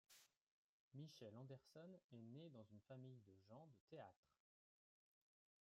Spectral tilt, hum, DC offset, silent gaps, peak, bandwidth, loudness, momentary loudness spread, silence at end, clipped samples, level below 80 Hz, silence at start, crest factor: -6.5 dB/octave; none; under 0.1%; 0.37-0.91 s, 2.04-2.09 s, 3.81-3.88 s, 4.16-4.23 s; -48 dBFS; 13.5 kHz; -63 LUFS; 6 LU; 1.35 s; under 0.1%; under -90 dBFS; 0.1 s; 18 dB